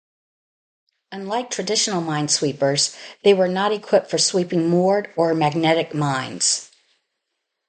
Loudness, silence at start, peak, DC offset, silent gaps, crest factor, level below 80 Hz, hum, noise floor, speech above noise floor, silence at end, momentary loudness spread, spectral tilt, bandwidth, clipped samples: -20 LUFS; 1.1 s; -4 dBFS; under 0.1%; none; 18 dB; -68 dBFS; none; -78 dBFS; 58 dB; 1.05 s; 7 LU; -3.5 dB/octave; 9.6 kHz; under 0.1%